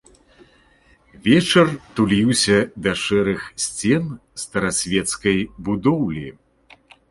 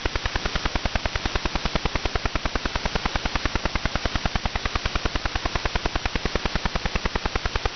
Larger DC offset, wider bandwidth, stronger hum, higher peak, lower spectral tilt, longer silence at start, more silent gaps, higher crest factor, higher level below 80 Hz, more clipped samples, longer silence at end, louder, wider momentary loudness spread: neither; first, 11.5 kHz vs 6.6 kHz; second, none vs 50 Hz at -35 dBFS; about the same, -2 dBFS vs -4 dBFS; first, -4.5 dB/octave vs -3 dB/octave; first, 1.25 s vs 0 s; neither; about the same, 18 dB vs 22 dB; second, -48 dBFS vs -28 dBFS; neither; first, 0.8 s vs 0 s; first, -19 LUFS vs -27 LUFS; first, 10 LU vs 1 LU